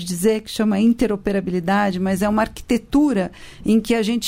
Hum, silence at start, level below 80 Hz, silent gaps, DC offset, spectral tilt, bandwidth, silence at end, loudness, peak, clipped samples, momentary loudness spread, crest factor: none; 0 s; -42 dBFS; none; under 0.1%; -5.5 dB/octave; 16 kHz; 0 s; -20 LUFS; -4 dBFS; under 0.1%; 5 LU; 14 dB